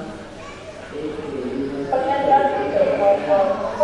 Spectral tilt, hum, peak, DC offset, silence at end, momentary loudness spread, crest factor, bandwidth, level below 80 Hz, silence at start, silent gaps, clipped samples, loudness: -6 dB/octave; none; -4 dBFS; under 0.1%; 0 s; 18 LU; 16 dB; 10.5 kHz; -50 dBFS; 0 s; none; under 0.1%; -20 LUFS